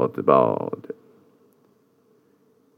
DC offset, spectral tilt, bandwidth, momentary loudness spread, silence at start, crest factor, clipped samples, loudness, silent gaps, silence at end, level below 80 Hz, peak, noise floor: under 0.1%; -9.5 dB/octave; 5 kHz; 22 LU; 0 s; 22 dB; under 0.1%; -21 LUFS; none; 1.85 s; -82 dBFS; -4 dBFS; -61 dBFS